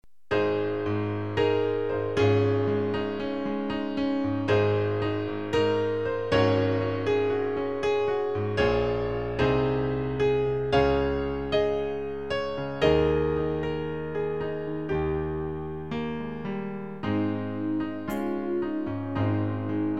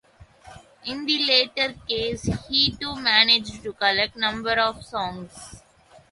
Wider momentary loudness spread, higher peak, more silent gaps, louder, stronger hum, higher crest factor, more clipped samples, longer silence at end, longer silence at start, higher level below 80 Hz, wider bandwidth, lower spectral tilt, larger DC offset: second, 8 LU vs 16 LU; second, -8 dBFS vs -2 dBFS; neither; second, -27 LUFS vs -21 LUFS; neither; about the same, 18 dB vs 22 dB; neither; second, 0 s vs 0.55 s; second, 0.3 s vs 0.45 s; first, -44 dBFS vs -50 dBFS; first, 13 kHz vs 11.5 kHz; first, -7.5 dB/octave vs -3.5 dB/octave; first, 0.5% vs under 0.1%